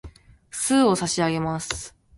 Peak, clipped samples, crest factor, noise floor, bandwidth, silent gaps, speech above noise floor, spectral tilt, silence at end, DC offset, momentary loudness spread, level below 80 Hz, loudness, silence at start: -8 dBFS; under 0.1%; 18 dB; -45 dBFS; 12 kHz; none; 23 dB; -4 dB/octave; 0.3 s; under 0.1%; 12 LU; -50 dBFS; -23 LUFS; 0.05 s